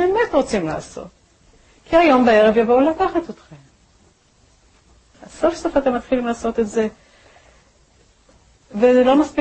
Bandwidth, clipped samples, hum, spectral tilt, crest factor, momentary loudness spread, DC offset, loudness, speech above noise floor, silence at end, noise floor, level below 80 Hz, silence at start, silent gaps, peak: 8.8 kHz; under 0.1%; none; -5.5 dB/octave; 16 dB; 14 LU; under 0.1%; -17 LUFS; 39 dB; 0 s; -56 dBFS; -46 dBFS; 0 s; none; -2 dBFS